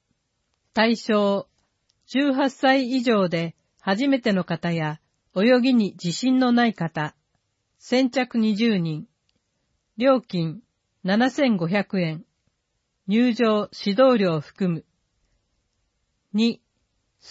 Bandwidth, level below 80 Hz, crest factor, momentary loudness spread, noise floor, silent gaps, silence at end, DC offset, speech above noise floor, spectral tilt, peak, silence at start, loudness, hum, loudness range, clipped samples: 8 kHz; -68 dBFS; 18 dB; 12 LU; -75 dBFS; none; 0 s; under 0.1%; 54 dB; -6 dB/octave; -4 dBFS; 0.75 s; -22 LUFS; none; 3 LU; under 0.1%